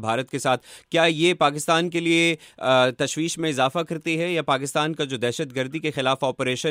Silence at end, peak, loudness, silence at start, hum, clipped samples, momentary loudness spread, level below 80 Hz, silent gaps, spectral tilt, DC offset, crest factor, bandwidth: 0 s; -6 dBFS; -22 LUFS; 0 s; none; under 0.1%; 7 LU; -68 dBFS; none; -4 dB/octave; under 0.1%; 18 dB; 16 kHz